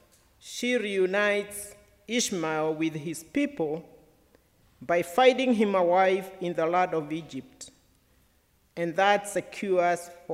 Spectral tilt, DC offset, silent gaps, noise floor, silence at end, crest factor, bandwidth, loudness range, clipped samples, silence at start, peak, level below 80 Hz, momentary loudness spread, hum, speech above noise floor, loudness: -4 dB/octave; under 0.1%; none; -66 dBFS; 0 s; 20 dB; 16 kHz; 5 LU; under 0.1%; 0.45 s; -8 dBFS; -68 dBFS; 17 LU; none; 39 dB; -26 LUFS